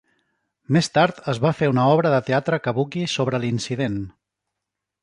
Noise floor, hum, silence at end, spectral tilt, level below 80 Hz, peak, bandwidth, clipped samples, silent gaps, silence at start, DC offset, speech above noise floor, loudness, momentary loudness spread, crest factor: -83 dBFS; 50 Hz at -55 dBFS; 0.95 s; -6 dB/octave; -56 dBFS; -4 dBFS; 11.5 kHz; under 0.1%; none; 0.7 s; under 0.1%; 63 dB; -21 LUFS; 8 LU; 18 dB